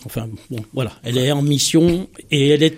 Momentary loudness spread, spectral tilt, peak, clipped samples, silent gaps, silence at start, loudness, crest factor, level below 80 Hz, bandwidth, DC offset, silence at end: 14 LU; -5 dB/octave; -2 dBFS; under 0.1%; none; 0.05 s; -18 LUFS; 16 dB; -46 dBFS; 16 kHz; under 0.1%; 0 s